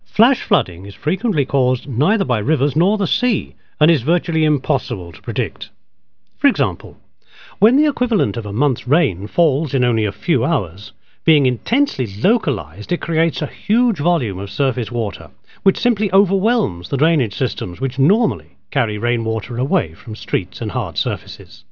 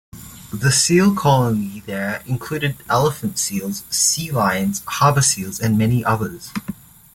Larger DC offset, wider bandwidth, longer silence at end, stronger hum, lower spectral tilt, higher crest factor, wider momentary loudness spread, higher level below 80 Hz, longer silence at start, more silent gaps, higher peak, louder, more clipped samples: first, 0.8% vs under 0.1%; second, 5.4 kHz vs 17 kHz; second, 0.1 s vs 0.4 s; neither; first, -8.5 dB/octave vs -4 dB/octave; about the same, 18 dB vs 16 dB; second, 10 LU vs 15 LU; about the same, -48 dBFS vs -48 dBFS; second, 0 s vs 0.15 s; neither; about the same, 0 dBFS vs -2 dBFS; about the same, -18 LUFS vs -18 LUFS; neither